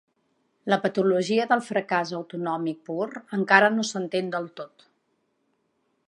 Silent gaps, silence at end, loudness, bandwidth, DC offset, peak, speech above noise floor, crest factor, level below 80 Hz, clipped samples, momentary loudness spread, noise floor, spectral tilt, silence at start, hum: none; 1.4 s; -24 LUFS; 11 kHz; under 0.1%; -2 dBFS; 48 dB; 24 dB; -80 dBFS; under 0.1%; 14 LU; -72 dBFS; -5 dB/octave; 0.65 s; none